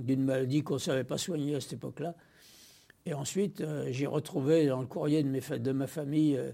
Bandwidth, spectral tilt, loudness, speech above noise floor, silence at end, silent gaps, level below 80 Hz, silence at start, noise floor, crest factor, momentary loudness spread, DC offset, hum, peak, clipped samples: 16.5 kHz; -6 dB/octave; -32 LUFS; 28 dB; 0 s; none; -70 dBFS; 0 s; -59 dBFS; 16 dB; 11 LU; under 0.1%; none; -14 dBFS; under 0.1%